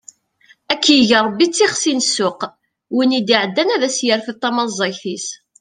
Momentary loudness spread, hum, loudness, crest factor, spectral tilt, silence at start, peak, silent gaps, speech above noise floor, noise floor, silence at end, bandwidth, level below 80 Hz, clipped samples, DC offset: 13 LU; none; -16 LUFS; 16 dB; -2.5 dB/octave; 0.7 s; 0 dBFS; none; 37 dB; -53 dBFS; 0.25 s; 10 kHz; -62 dBFS; under 0.1%; under 0.1%